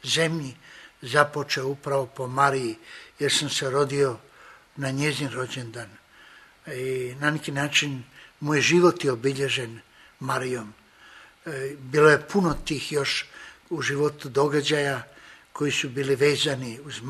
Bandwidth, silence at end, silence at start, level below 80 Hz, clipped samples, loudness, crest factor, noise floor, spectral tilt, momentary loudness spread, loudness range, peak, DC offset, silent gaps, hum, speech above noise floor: 13.5 kHz; 0 s; 0.05 s; -54 dBFS; under 0.1%; -25 LUFS; 24 dB; -52 dBFS; -4 dB/octave; 18 LU; 5 LU; -2 dBFS; under 0.1%; none; none; 27 dB